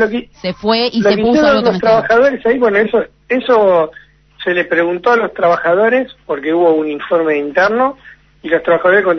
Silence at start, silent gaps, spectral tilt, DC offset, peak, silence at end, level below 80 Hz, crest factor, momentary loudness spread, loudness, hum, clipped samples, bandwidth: 0 s; none; -6 dB/octave; under 0.1%; 0 dBFS; 0 s; -48 dBFS; 12 dB; 8 LU; -13 LUFS; none; under 0.1%; 6.4 kHz